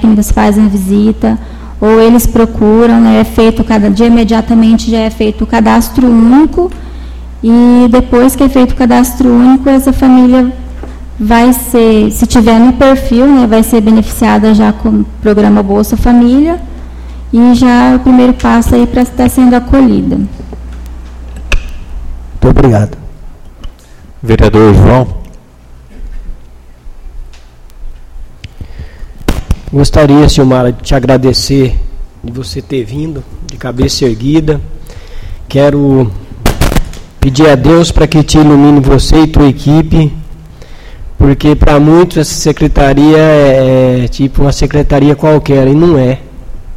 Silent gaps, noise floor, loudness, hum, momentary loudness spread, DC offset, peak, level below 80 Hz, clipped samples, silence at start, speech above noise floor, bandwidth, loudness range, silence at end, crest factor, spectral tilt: none; -33 dBFS; -7 LUFS; none; 17 LU; under 0.1%; 0 dBFS; -18 dBFS; 2%; 0 s; 28 dB; 15.5 kHz; 7 LU; 0 s; 8 dB; -6.5 dB/octave